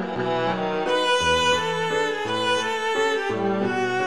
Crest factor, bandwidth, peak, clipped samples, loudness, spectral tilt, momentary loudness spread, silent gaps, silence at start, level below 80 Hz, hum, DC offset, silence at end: 14 dB; 13 kHz; -10 dBFS; under 0.1%; -22 LUFS; -3.5 dB/octave; 5 LU; none; 0 s; -52 dBFS; none; 0.4%; 0 s